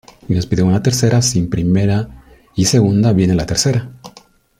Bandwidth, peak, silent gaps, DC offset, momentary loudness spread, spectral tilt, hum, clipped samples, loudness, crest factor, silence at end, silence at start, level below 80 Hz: 15.5 kHz; -2 dBFS; none; under 0.1%; 8 LU; -5.5 dB/octave; none; under 0.1%; -15 LUFS; 14 dB; 0.5 s; 0.3 s; -38 dBFS